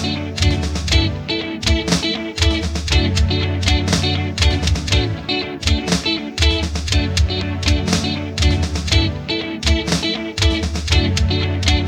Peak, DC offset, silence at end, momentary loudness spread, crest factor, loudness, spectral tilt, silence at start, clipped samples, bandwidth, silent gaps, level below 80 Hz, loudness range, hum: 0 dBFS; under 0.1%; 0 s; 4 LU; 18 dB; -18 LUFS; -4.5 dB/octave; 0 s; under 0.1%; 14 kHz; none; -22 dBFS; 1 LU; none